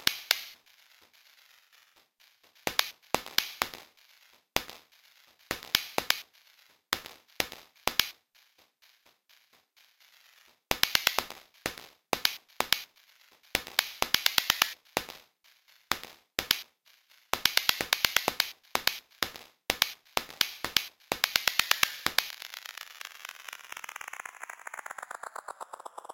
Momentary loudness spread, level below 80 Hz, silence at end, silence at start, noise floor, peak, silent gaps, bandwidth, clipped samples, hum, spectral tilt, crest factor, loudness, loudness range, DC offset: 18 LU; -62 dBFS; 0.5 s; 0 s; -65 dBFS; -6 dBFS; none; 17 kHz; under 0.1%; none; 0 dB/octave; 30 dB; -30 LUFS; 7 LU; under 0.1%